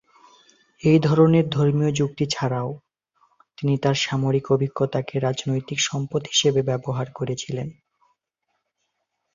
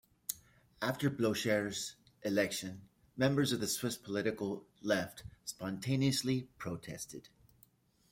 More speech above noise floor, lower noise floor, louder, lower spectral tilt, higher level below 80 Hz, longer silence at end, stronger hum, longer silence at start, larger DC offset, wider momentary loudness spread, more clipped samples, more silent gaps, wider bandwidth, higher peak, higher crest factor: first, 55 dB vs 33 dB; first, -77 dBFS vs -69 dBFS; first, -22 LUFS vs -36 LUFS; about the same, -5.5 dB/octave vs -4.5 dB/octave; first, -58 dBFS vs -68 dBFS; first, 1.65 s vs 0.85 s; neither; first, 0.85 s vs 0.3 s; neither; second, 11 LU vs 14 LU; neither; neither; second, 7.6 kHz vs 16.5 kHz; first, -4 dBFS vs -16 dBFS; about the same, 18 dB vs 20 dB